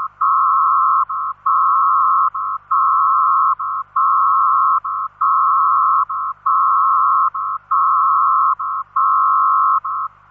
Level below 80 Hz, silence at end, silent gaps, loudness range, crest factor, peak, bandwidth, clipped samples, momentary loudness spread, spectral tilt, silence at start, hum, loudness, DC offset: -64 dBFS; 0.25 s; none; 1 LU; 10 dB; -6 dBFS; 2.5 kHz; under 0.1%; 7 LU; -6 dB/octave; 0 s; 50 Hz at -60 dBFS; -15 LUFS; under 0.1%